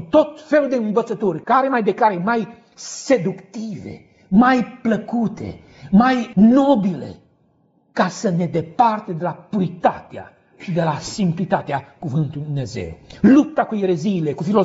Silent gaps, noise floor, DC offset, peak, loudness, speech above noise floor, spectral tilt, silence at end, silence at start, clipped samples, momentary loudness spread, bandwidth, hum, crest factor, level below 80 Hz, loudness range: none; -60 dBFS; under 0.1%; -2 dBFS; -19 LUFS; 41 dB; -6.5 dB/octave; 0 s; 0 s; under 0.1%; 17 LU; 8 kHz; none; 16 dB; -52 dBFS; 5 LU